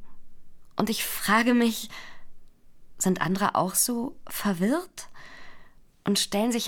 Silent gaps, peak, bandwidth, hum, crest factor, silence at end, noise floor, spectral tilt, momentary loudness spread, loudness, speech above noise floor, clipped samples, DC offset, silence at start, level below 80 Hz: none; -8 dBFS; 20 kHz; none; 20 dB; 0 s; -48 dBFS; -3.5 dB/octave; 19 LU; -26 LUFS; 22 dB; under 0.1%; under 0.1%; 0 s; -54 dBFS